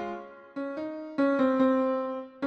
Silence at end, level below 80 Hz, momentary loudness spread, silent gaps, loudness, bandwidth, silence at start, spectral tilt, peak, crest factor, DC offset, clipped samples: 0 s; -72 dBFS; 14 LU; none; -28 LUFS; 6.2 kHz; 0 s; -7 dB/octave; -12 dBFS; 16 dB; under 0.1%; under 0.1%